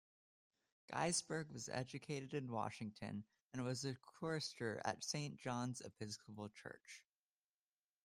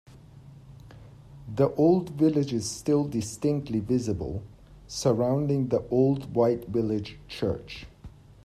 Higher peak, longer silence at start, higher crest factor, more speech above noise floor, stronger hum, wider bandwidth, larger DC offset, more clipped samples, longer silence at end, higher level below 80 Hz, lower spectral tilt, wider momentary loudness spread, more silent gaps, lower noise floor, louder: second, -26 dBFS vs -10 dBFS; first, 0.9 s vs 0.1 s; about the same, 22 dB vs 18 dB; first, over 44 dB vs 23 dB; neither; first, 15 kHz vs 13.5 kHz; neither; neither; first, 1.05 s vs 0.15 s; second, -80 dBFS vs -52 dBFS; second, -4 dB/octave vs -7 dB/octave; about the same, 12 LU vs 14 LU; first, 3.41-3.50 s vs none; first, under -90 dBFS vs -49 dBFS; second, -46 LUFS vs -27 LUFS